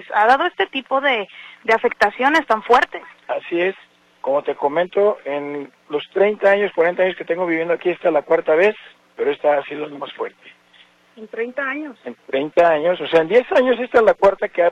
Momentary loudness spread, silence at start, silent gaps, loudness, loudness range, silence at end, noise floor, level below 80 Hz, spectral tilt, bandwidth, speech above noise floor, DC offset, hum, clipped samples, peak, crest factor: 14 LU; 0 s; none; -18 LUFS; 6 LU; 0 s; -52 dBFS; -60 dBFS; -5 dB/octave; 10 kHz; 34 dB; under 0.1%; none; under 0.1%; -2 dBFS; 16 dB